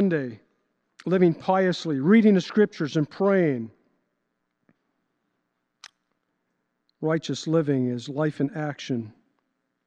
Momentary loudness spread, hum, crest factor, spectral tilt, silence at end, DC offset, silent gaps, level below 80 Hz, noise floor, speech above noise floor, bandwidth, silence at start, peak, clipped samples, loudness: 12 LU; none; 18 dB; -7 dB/octave; 0.75 s; under 0.1%; none; -76 dBFS; -77 dBFS; 54 dB; 8.6 kHz; 0 s; -8 dBFS; under 0.1%; -24 LUFS